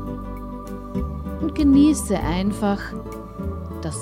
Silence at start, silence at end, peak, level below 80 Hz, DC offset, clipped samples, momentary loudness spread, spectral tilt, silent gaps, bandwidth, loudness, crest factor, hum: 0 s; 0 s; -6 dBFS; -34 dBFS; under 0.1%; under 0.1%; 17 LU; -6 dB/octave; none; 15 kHz; -22 LUFS; 16 dB; none